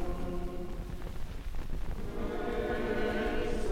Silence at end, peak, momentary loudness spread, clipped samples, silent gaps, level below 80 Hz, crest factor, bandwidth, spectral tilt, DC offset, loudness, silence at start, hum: 0 s; -18 dBFS; 11 LU; under 0.1%; none; -38 dBFS; 14 dB; 15.5 kHz; -6.5 dB/octave; under 0.1%; -37 LUFS; 0 s; none